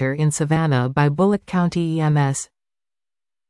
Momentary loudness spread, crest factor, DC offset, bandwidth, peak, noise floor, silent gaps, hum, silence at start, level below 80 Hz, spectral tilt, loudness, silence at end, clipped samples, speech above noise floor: 4 LU; 14 dB; under 0.1%; 12 kHz; -6 dBFS; under -90 dBFS; none; none; 0 s; -52 dBFS; -6.5 dB/octave; -20 LUFS; 1.05 s; under 0.1%; over 71 dB